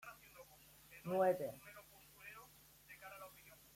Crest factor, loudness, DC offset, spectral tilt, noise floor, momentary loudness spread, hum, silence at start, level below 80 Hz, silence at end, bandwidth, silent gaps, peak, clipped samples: 22 dB; -41 LUFS; under 0.1%; -5.5 dB/octave; -65 dBFS; 25 LU; none; 0.05 s; -78 dBFS; 0.2 s; 16.5 kHz; none; -24 dBFS; under 0.1%